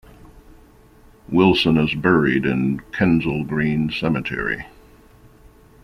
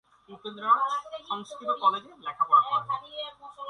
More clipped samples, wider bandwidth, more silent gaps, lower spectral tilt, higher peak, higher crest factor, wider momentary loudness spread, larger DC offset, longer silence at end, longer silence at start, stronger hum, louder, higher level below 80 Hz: neither; first, 13.5 kHz vs 10.5 kHz; neither; first, -7.5 dB/octave vs -3.5 dB/octave; first, -2 dBFS vs -10 dBFS; about the same, 18 dB vs 18 dB; second, 8 LU vs 17 LU; neither; first, 1.15 s vs 0 s; about the same, 0.25 s vs 0.3 s; neither; first, -19 LUFS vs -26 LUFS; first, -44 dBFS vs -76 dBFS